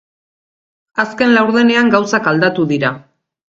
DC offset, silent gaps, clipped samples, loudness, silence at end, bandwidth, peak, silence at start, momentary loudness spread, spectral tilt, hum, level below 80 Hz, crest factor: under 0.1%; none; under 0.1%; -13 LUFS; 0.6 s; 7.6 kHz; 0 dBFS; 0.95 s; 9 LU; -5.5 dB/octave; none; -58 dBFS; 16 dB